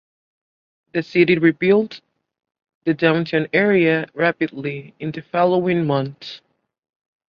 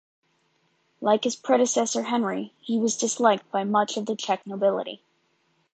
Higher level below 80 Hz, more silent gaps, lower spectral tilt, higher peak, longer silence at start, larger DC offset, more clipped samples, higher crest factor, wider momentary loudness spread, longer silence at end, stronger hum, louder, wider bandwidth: first, -62 dBFS vs -78 dBFS; first, 2.75-2.81 s vs none; first, -8.5 dB/octave vs -3.5 dB/octave; first, -2 dBFS vs -6 dBFS; about the same, 0.95 s vs 1 s; neither; neither; about the same, 18 dB vs 20 dB; first, 14 LU vs 8 LU; about the same, 0.9 s vs 0.8 s; neither; first, -19 LUFS vs -25 LUFS; second, 6.6 kHz vs 9.2 kHz